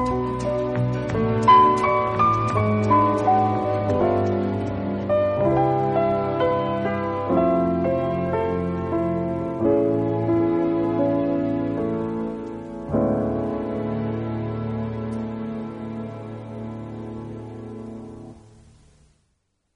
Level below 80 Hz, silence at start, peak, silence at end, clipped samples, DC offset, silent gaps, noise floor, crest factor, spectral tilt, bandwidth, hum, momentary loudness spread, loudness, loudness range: -46 dBFS; 0 s; -4 dBFS; 1.35 s; under 0.1%; under 0.1%; none; -71 dBFS; 18 dB; -8.5 dB/octave; 10 kHz; none; 15 LU; -22 LUFS; 14 LU